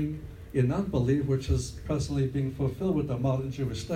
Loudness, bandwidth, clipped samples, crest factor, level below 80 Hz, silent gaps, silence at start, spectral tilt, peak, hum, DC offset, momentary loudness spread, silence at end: -29 LUFS; 12.5 kHz; under 0.1%; 16 dB; -44 dBFS; none; 0 s; -7.5 dB/octave; -12 dBFS; none; under 0.1%; 6 LU; 0 s